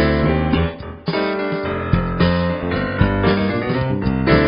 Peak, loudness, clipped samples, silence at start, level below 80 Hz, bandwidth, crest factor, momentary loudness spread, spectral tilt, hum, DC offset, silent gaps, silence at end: 0 dBFS; -19 LUFS; under 0.1%; 0 s; -30 dBFS; 5.4 kHz; 18 dB; 6 LU; -6 dB/octave; none; under 0.1%; none; 0 s